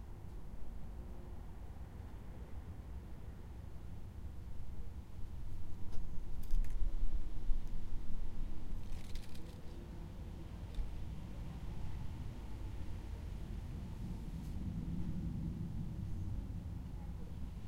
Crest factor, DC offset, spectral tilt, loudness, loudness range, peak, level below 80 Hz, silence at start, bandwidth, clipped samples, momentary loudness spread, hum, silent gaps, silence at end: 18 dB; under 0.1%; -7.5 dB/octave; -48 LUFS; 7 LU; -18 dBFS; -42 dBFS; 0 s; 6.4 kHz; under 0.1%; 9 LU; none; none; 0 s